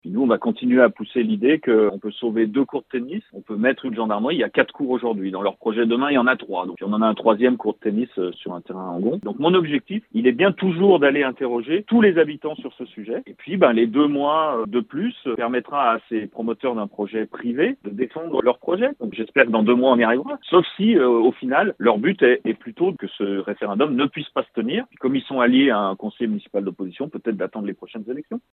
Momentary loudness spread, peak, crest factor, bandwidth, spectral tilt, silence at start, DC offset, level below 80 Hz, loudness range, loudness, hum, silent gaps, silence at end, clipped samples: 12 LU; 0 dBFS; 20 dB; 4.1 kHz; -9.5 dB/octave; 0.05 s; under 0.1%; -70 dBFS; 5 LU; -21 LUFS; none; none; 0.15 s; under 0.1%